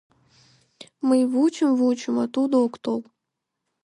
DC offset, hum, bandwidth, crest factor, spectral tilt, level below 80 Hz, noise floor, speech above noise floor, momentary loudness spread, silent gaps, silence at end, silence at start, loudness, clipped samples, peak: under 0.1%; none; 11 kHz; 14 dB; -5 dB/octave; -76 dBFS; -82 dBFS; 61 dB; 9 LU; none; 0.8 s; 0.8 s; -22 LUFS; under 0.1%; -10 dBFS